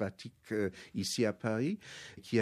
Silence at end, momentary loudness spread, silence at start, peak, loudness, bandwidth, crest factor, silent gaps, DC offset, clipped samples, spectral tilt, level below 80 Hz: 0 s; 15 LU; 0 s; -18 dBFS; -36 LUFS; 14.5 kHz; 18 dB; none; under 0.1%; under 0.1%; -5 dB/octave; -72 dBFS